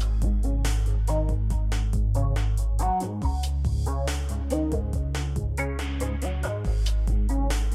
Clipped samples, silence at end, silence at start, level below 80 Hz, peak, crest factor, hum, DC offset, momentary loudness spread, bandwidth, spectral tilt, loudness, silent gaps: under 0.1%; 0 s; 0 s; -24 dBFS; -14 dBFS; 10 dB; none; under 0.1%; 3 LU; 13.5 kHz; -6 dB/octave; -27 LUFS; none